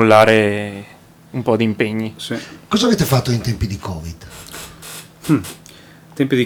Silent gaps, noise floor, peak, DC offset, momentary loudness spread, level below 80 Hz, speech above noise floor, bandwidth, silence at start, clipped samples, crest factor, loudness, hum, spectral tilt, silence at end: none; -42 dBFS; 0 dBFS; under 0.1%; 19 LU; -40 dBFS; 26 dB; over 20 kHz; 0 s; under 0.1%; 18 dB; -18 LUFS; none; -5.5 dB/octave; 0 s